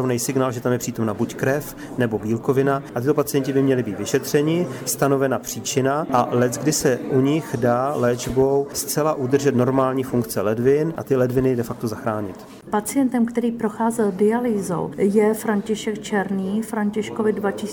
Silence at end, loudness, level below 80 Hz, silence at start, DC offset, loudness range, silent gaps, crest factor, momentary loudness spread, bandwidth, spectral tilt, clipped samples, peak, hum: 0 s; -21 LUFS; -52 dBFS; 0 s; under 0.1%; 2 LU; none; 16 dB; 6 LU; over 20 kHz; -5.5 dB/octave; under 0.1%; -4 dBFS; none